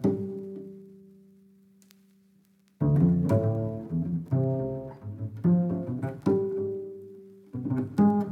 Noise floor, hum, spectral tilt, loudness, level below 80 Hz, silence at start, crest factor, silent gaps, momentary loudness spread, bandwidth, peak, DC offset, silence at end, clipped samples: -63 dBFS; none; -11 dB/octave; -28 LUFS; -56 dBFS; 0 s; 16 dB; none; 18 LU; 6.2 kHz; -12 dBFS; under 0.1%; 0 s; under 0.1%